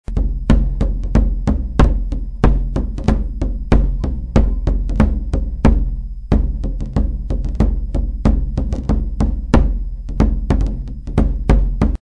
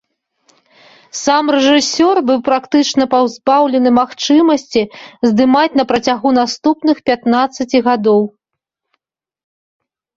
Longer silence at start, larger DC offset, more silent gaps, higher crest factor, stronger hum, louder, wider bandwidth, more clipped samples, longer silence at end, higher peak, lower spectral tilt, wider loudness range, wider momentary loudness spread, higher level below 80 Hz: second, 0.05 s vs 1.15 s; first, 1% vs under 0.1%; neither; about the same, 16 dB vs 14 dB; neither; second, -19 LUFS vs -13 LUFS; second, 6.8 kHz vs 7.8 kHz; neither; second, 0.2 s vs 1.9 s; about the same, 0 dBFS vs 0 dBFS; first, -8.5 dB/octave vs -4 dB/octave; about the same, 2 LU vs 3 LU; first, 7 LU vs 4 LU; first, -18 dBFS vs -56 dBFS